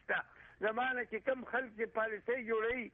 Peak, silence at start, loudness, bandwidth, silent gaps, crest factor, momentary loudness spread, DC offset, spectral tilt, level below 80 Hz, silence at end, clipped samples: -22 dBFS; 0.1 s; -37 LUFS; 3.9 kHz; none; 16 dB; 4 LU; under 0.1%; -7 dB/octave; -70 dBFS; 0.05 s; under 0.1%